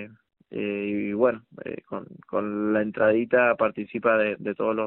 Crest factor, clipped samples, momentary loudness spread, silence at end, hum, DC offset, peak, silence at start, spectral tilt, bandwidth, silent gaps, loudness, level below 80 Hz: 18 dB; under 0.1%; 17 LU; 0 s; none; under 0.1%; -8 dBFS; 0 s; -5 dB/octave; 4.1 kHz; none; -25 LUFS; -66 dBFS